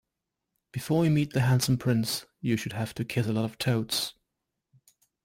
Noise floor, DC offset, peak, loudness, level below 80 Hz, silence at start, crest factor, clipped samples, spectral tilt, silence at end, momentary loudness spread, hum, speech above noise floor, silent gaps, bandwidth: -85 dBFS; under 0.1%; -14 dBFS; -28 LUFS; -60 dBFS; 0.75 s; 16 dB; under 0.1%; -5.5 dB/octave; 1.15 s; 9 LU; none; 58 dB; none; 16.5 kHz